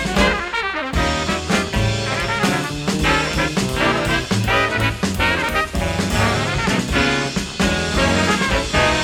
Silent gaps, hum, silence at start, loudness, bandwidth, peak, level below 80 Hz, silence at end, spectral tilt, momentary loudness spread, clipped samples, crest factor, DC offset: none; none; 0 s; -18 LUFS; 18 kHz; -2 dBFS; -30 dBFS; 0 s; -4 dB/octave; 4 LU; under 0.1%; 16 dB; under 0.1%